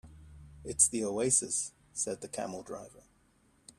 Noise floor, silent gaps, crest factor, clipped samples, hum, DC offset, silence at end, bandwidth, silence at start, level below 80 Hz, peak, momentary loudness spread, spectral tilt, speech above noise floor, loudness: -68 dBFS; none; 26 dB; under 0.1%; none; under 0.1%; 0.8 s; 15 kHz; 0.05 s; -62 dBFS; -10 dBFS; 18 LU; -3 dB/octave; 35 dB; -30 LUFS